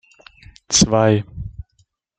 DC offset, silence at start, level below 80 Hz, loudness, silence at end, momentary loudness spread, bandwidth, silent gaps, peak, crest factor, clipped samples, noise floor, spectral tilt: under 0.1%; 0.7 s; -40 dBFS; -16 LUFS; 0.6 s; 20 LU; 9.6 kHz; none; -2 dBFS; 18 dB; under 0.1%; -62 dBFS; -4 dB/octave